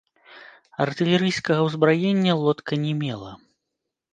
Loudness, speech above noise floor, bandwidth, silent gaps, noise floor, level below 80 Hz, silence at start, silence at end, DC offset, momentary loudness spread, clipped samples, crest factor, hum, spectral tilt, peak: -22 LUFS; 60 dB; 9.2 kHz; none; -82 dBFS; -64 dBFS; 0.3 s; 0.75 s; under 0.1%; 12 LU; under 0.1%; 20 dB; none; -6.5 dB/octave; -4 dBFS